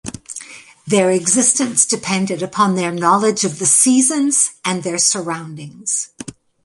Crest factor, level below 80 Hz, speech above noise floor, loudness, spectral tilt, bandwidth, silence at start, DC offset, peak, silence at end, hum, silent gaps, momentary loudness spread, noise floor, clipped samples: 18 dB; -58 dBFS; 21 dB; -15 LUFS; -3 dB/octave; 12 kHz; 0.05 s; under 0.1%; 0 dBFS; 0.35 s; none; none; 18 LU; -37 dBFS; under 0.1%